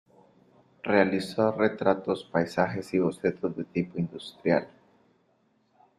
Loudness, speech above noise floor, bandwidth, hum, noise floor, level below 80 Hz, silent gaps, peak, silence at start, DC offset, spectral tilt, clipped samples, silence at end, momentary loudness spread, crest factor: -28 LUFS; 42 dB; 13.5 kHz; none; -68 dBFS; -66 dBFS; none; -6 dBFS; 0.85 s; under 0.1%; -7 dB/octave; under 0.1%; 1.3 s; 9 LU; 22 dB